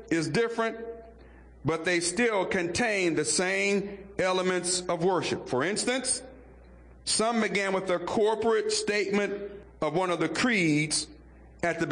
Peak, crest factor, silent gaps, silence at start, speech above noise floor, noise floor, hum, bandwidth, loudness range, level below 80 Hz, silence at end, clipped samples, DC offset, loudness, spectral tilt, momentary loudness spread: -16 dBFS; 12 dB; none; 0 s; 24 dB; -51 dBFS; none; 10.5 kHz; 2 LU; -58 dBFS; 0 s; under 0.1%; under 0.1%; -27 LUFS; -3.5 dB/octave; 8 LU